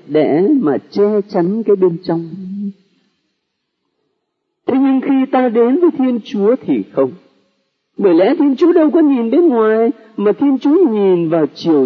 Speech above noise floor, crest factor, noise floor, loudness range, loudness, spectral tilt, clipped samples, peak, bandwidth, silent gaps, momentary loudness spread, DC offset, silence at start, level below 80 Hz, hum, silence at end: 59 dB; 14 dB; -72 dBFS; 8 LU; -13 LUFS; -9 dB/octave; under 0.1%; 0 dBFS; 6.2 kHz; none; 8 LU; under 0.1%; 0.1 s; -70 dBFS; none; 0 s